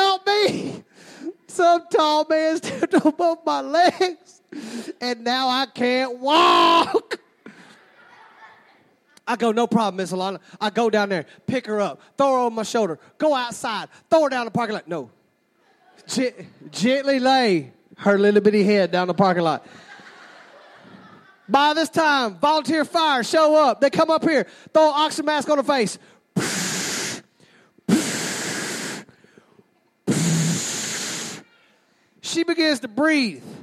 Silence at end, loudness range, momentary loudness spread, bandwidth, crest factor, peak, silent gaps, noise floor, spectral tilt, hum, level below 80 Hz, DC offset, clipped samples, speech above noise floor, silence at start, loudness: 0 s; 7 LU; 13 LU; 15 kHz; 18 dB; -4 dBFS; none; -63 dBFS; -4 dB/octave; none; -70 dBFS; under 0.1%; under 0.1%; 43 dB; 0 s; -20 LUFS